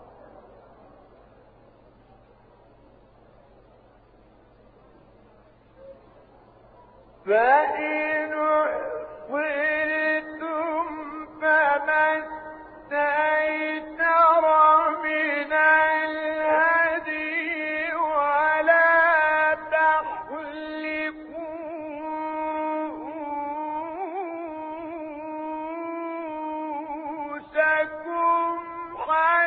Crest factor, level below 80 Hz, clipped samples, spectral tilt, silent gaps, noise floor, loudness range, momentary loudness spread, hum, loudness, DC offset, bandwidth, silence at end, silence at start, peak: 18 dB; -62 dBFS; under 0.1%; -7.5 dB/octave; none; -55 dBFS; 11 LU; 16 LU; none; -23 LUFS; under 0.1%; 4.8 kHz; 0 s; 0 s; -8 dBFS